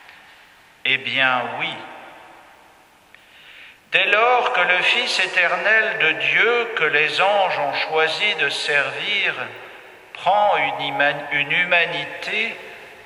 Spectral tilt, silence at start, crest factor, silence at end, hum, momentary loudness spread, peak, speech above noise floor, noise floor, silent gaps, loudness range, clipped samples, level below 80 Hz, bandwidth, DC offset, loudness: -2.5 dB/octave; 0.85 s; 20 dB; 0 s; none; 10 LU; 0 dBFS; 32 dB; -51 dBFS; none; 7 LU; under 0.1%; -70 dBFS; 15.5 kHz; under 0.1%; -18 LUFS